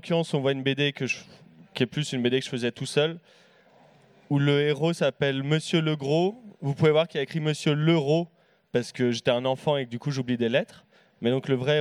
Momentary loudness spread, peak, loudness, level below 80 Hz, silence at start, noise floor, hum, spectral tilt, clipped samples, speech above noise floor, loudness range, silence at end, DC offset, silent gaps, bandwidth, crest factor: 8 LU; -8 dBFS; -26 LUFS; -70 dBFS; 0.05 s; -57 dBFS; none; -6 dB/octave; under 0.1%; 32 dB; 3 LU; 0 s; under 0.1%; none; 11.5 kHz; 18 dB